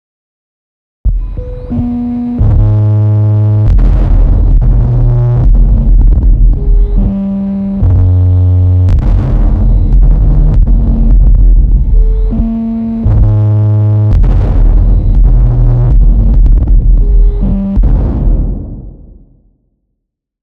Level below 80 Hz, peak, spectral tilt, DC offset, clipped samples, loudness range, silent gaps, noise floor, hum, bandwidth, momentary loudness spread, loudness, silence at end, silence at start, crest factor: -8 dBFS; 0 dBFS; -11.5 dB/octave; under 0.1%; under 0.1%; 3 LU; none; -70 dBFS; none; 2.1 kHz; 6 LU; -10 LUFS; 1.4 s; 1.05 s; 6 dB